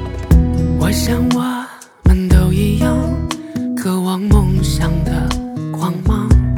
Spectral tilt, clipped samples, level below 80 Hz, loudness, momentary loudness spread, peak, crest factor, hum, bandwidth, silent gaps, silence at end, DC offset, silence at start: -6.5 dB/octave; under 0.1%; -18 dBFS; -16 LUFS; 9 LU; 0 dBFS; 14 dB; none; 17.5 kHz; none; 0 s; under 0.1%; 0 s